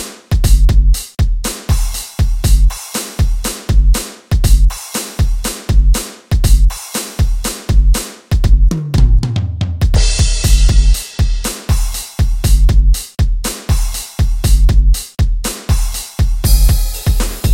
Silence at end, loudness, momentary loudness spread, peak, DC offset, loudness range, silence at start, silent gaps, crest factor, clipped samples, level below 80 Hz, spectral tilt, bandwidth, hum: 0 s; -15 LUFS; 7 LU; 0 dBFS; under 0.1%; 2 LU; 0 s; none; 12 dB; under 0.1%; -12 dBFS; -4.5 dB/octave; 16.5 kHz; none